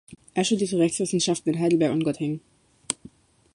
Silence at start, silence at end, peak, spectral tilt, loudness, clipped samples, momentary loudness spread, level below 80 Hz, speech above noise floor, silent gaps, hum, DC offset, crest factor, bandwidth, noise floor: 0.1 s; 0.6 s; -4 dBFS; -4.5 dB/octave; -25 LUFS; under 0.1%; 10 LU; -64 dBFS; 27 dB; none; none; under 0.1%; 22 dB; 11.5 kHz; -51 dBFS